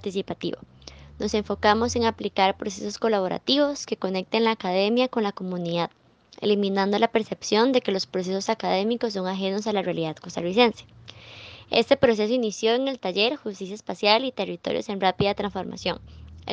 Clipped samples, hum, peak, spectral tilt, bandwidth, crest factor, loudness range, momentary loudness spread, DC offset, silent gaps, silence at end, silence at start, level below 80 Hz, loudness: under 0.1%; none; -4 dBFS; -4.5 dB/octave; 9.6 kHz; 22 dB; 2 LU; 11 LU; under 0.1%; none; 0 s; 0 s; -56 dBFS; -24 LUFS